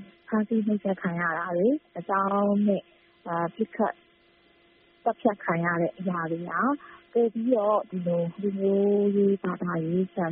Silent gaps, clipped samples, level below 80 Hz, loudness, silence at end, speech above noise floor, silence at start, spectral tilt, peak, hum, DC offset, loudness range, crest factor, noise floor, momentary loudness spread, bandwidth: none; under 0.1%; -70 dBFS; -27 LUFS; 0 s; 35 dB; 0 s; -7.5 dB/octave; -10 dBFS; none; under 0.1%; 4 LU; 16 dB; -61 dBFS; 7 LU; 3.7 kHz